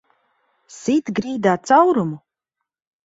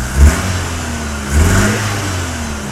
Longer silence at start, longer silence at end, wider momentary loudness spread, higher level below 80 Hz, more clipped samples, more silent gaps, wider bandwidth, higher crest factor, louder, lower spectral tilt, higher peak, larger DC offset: first, 0.7 s vs 0 s; first, 0.85 s vs 0 s; first, 14 LU vs 9 LU; second, -62 dBFS vs -18 dBFS; second, under 0.1% vs 0.2%; neither; second, 8 kHz vs 15 kHz; about the same, 18 dB vs 14 dB; second, -18 LUFS vs -15 LUFS; first, -6 dB/octave vs -4.5 dB/octave; about the same, -2 dBFS vs 0 dBFS; neither